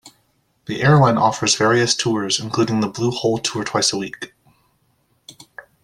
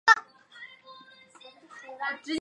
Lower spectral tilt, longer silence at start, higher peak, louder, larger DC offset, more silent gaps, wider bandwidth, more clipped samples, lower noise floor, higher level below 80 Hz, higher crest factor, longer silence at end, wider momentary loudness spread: first, -4 dB/octave vs -1 dB/octave; about the same, 0.05 s vs 0.05 s; first, -2 dBFS vs -6 dBFS; first, -18 LUFS vs -27 LUFS; neither; neither; first, 13 kHz vs 11 kHz; neither; first, -64 dBFS vs -53 dBFS; first, -54 dBFS vs -78 dBFS; second, 18 dB vs 26 dB; first, 0.25 s vs 0 s; second, 16 LU vs 28 LU